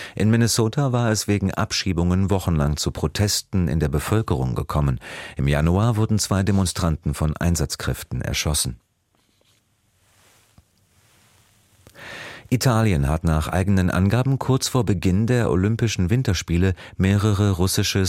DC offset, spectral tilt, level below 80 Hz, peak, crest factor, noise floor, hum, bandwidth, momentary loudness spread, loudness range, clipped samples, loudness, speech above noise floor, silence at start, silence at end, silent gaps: under 0.1%; -5.5 dB/octave; -34 dBFS; -6 dBFS; 16 dB; -65 dBFS; none; 16.5 kHz; 6 LU; 7 LU; under 0.1%; -21 LUFS; 45 dB; 0 s; 0 s; none